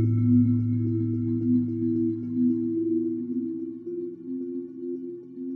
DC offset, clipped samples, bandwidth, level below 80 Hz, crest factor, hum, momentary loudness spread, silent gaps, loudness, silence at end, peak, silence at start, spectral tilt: under 0.1%; under 0.1%; 2.3 kHz; -60 dBFS; 14 dB; none; 13 LU; none; -27 LUFS; 0 s; -12 dBFS; 0 s; -14 dB/octave